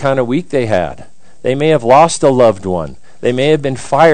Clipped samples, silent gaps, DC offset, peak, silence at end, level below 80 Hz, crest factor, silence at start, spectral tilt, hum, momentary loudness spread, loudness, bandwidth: 1%; none; 4%; 0 dBFS; 0 s; -46 dBFS; 12 dB; 0 s; -5.5 dB/octave; none; 12 LU; -13 LUFS; 10 kHz